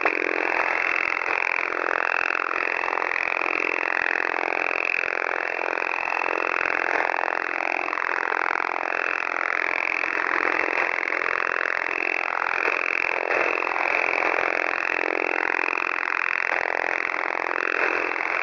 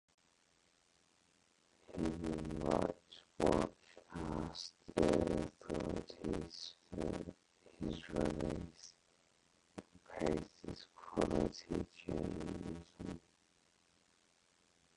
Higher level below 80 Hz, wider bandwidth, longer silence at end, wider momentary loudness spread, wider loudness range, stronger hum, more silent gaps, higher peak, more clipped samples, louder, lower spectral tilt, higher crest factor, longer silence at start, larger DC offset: second, -64 dBFS vs -56 dBFS; second, 6 kHz vs 11.5 kHz; second, 0 s vs 1.8 s; second, 3 LU vs 17 LU; second, 1 LU vs 6 LU; neither; neither; first, -6 dBFS vs -18 dBFS; neither; first, -23 LUFS vs -41 LUFS; second, -3 dB/octave vs -6 dB/octave; second, 18 dB vs 24 dB; second, 0 s vs 1.9 s; neither